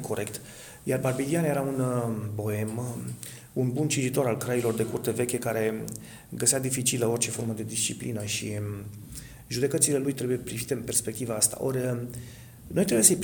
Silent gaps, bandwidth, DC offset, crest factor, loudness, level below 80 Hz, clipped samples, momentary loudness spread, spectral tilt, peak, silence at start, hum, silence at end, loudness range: none; 19 kHz; under 0.1%; 24 dB; -27 LUFS; -58 dBFS; under 0.1%; 15 LU; -4 dB/octave; -4 dBFS; 0 s; none; 0 s; 2 LU